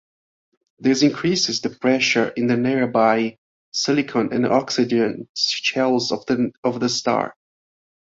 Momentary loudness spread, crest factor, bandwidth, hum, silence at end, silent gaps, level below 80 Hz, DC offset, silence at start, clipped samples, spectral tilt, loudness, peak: 6 LU; 18 dB; 7.8 kHz; none; 0.8 s; 3.38-3.72 s, 5.29-5.34 s, 6.58-6.63 s; -62 dBFS; under 0.1%; 0.8 s; under 0.1%; -4 dB/octave; -20 LUFS; -2 dBFS